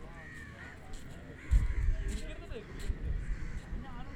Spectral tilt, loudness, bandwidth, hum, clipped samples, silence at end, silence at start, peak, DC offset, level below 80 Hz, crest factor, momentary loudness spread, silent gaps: -6 dB/octave; -40 LUFS; 11 kHz; none; under 0.1%; 0 s; 0 s; -14 dBFS; under 0.1%; -36 dBFS; 20 dB; 15 LU; none